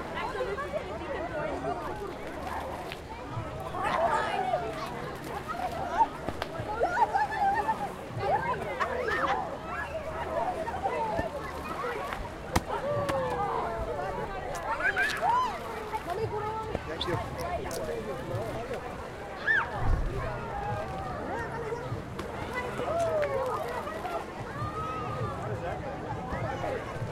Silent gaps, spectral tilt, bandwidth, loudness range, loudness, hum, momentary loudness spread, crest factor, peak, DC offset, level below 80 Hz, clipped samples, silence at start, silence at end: none; -5.5 dB/octave; 16 kHz; 5 LU; -32 LUFS; none; 9 LU; 22 dB; -10 dBFS; under 0.1%; -44 dBFS; under 0.1%; 0 s; 0 s